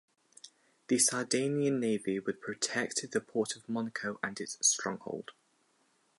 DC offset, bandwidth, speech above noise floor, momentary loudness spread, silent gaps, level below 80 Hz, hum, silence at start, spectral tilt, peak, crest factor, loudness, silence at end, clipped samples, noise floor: under 0.1%; 12 kHz; 39 dB; 11 LU; none; -80 dBFS; none; 0.45 s; -3 dB/octave; -14 dBFS; 22 dB; -32 LUFS; 0.9 s; under 0.1%; -72 dBFS